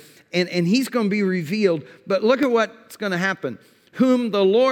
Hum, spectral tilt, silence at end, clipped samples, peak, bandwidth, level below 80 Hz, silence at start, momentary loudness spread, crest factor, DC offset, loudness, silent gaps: none; -6 dB/octave; 0 s; under 0.1%; -6 dBFS; 18.5 kHz; -76 dBFS; 0.35 s; 9 LU; 14 dB; under 0.1%; -21 LUFS; none